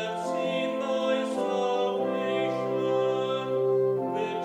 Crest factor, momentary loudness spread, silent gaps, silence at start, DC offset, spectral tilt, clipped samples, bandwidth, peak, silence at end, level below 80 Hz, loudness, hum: 12 dB; 3 LU; none; 0 s; under 0.1%; -5.5 dB/octave; under 0.1%; 11.5 kHz; -16 dBFS; 0 s; -76 dBFS; -27 LUFS; none